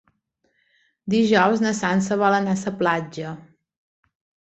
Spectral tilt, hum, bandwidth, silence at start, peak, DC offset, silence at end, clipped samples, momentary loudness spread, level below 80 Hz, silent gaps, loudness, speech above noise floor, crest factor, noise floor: -5.5 dB/octave; none; 8.2 kHz; 1.05 s; -4 dBFS; under 0.1%; 1 s; under 0.1%; 16 LU; -62 dBFS; none; -21 LUFS; 49 dB; 20 dB; -70 dBFS